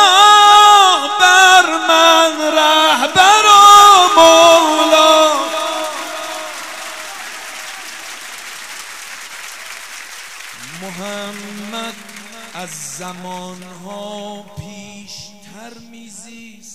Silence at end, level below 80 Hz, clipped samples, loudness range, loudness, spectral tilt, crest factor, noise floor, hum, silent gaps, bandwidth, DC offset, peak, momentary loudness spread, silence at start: 1.05 s; -58 dBFS; 0.4%; 22 LU; -8 LUFS; -0.5 dB/octave; 14 dB; -37 dBFS; none; none; 16.5 kHz; 0.5%; 0 dBFS; 24 LU; 0 s